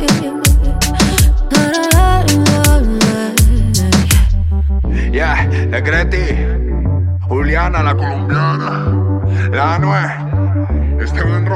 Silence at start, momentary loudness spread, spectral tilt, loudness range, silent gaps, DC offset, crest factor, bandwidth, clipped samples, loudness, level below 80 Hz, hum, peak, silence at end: 0 s; 5 LU; -5 dB/octave; 4 LU; none; under 0.1%; 12 dB; 16 kHz; under 0.1%; -14 LUFS; -16 dBFS; none; 0 dBFS; 0 s